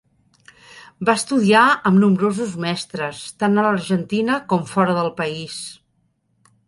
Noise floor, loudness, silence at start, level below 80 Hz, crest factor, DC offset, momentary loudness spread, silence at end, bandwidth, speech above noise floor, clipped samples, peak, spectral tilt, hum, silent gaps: -66 dBFS; -19 LUFS; 0.75 s; -60 dBFS; 18 dB; under 0.1%; 13 LU; 0.95 s; 11.5 kHz; 48 dB; under 0.1%; -2 dBFS; -5.5 dB/octave; none; none